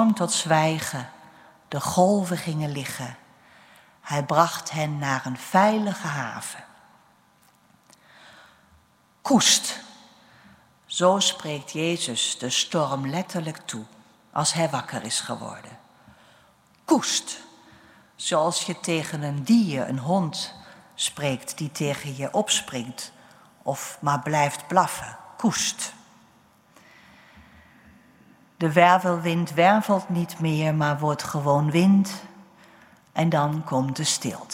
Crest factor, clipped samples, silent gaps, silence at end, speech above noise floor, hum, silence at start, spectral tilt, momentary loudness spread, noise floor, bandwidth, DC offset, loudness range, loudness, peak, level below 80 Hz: 24 dB; under 0.1%; none; 0 s; 36 dB; none; 0 s; -4 dB/octave; 15 LU; -60 dBFS; 16 kHz; under 0.1%; 7 LU; -24 LUFS; -2 dBFS; -66 dBFS